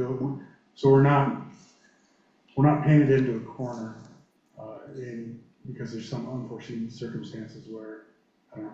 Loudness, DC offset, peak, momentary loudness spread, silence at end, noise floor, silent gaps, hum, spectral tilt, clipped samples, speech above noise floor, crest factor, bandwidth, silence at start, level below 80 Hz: -25 LUFS; under 0.1%; -8 dBFS; 24 LU; 0 s; -64 dBFS; none; none; -9 dB/octave; under 0.1%; 39 dB; 20 dB; 7.4 kHz; 0 s; -60 dBFS